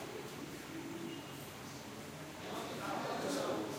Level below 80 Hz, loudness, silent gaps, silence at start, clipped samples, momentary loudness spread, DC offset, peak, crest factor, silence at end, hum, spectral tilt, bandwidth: -72 dBFS; -43 LUFS; none; 0 s; under 0.1%; 10 LU; under 0.1%; -26 dBFS; 16 dB; 0 s; none; -4 dB/octave; 16.5 kHz